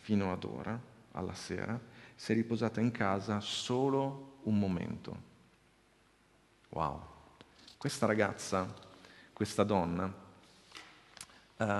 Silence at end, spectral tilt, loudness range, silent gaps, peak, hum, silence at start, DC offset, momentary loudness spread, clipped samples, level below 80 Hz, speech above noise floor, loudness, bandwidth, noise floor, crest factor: 0 s; -5.5 dB/octave; 6 LU; none; -12 dBFS; none; 0.05 s; under 0.1%; 21 LU; under 0.1%; -60 dBFS; 33 dB; -35 LUFS; 12.5 kHz; -68 dBFS; 24 dB